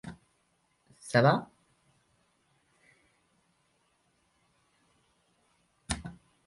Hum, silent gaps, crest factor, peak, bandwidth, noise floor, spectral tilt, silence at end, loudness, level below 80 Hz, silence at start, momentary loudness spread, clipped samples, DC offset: none; none; 26 dB; -10 dBFS; 11.5 kHz; -73 dBFS; -5.5 dB/octave; 0.35 s; -29 LUFS; -58 dBFS; 0.05 s; 25 LU; under 0.1%; under 0.1%